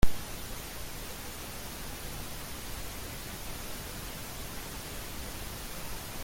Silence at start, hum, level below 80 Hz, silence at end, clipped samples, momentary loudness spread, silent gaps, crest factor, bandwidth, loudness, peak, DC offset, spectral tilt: 0 s; none; -42 dBFS; 0 s; under 0.1%; 1 LU; none; 24 dB; 17 kHz; -40 LUFS; -10 dBFS; under 0.1%; -3.5 dB/octave